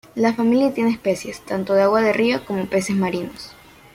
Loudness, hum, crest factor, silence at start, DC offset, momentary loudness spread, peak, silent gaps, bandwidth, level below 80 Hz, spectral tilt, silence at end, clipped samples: -20 LUFS; none; 16 dB; 0.15 s; under 0.1%; 11 LU; -4 dBFS; none; 16 kHz; -56 dBFS; -5.5 dB/octave; 0.45 s; under 0.1%